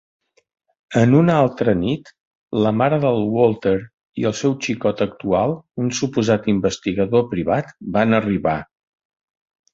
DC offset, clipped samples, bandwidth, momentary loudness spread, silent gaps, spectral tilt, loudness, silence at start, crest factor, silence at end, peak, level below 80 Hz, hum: under 0.1%; under 0.1%; 7.8 kHz; 8 LU; 2.20-2.48 s, 3.93-3.98 s; -6.5 dB/octave; -19 LUFS; 0.9 s; 18 dB; 1.1 s; -2 dBFS; -48 dBFS; none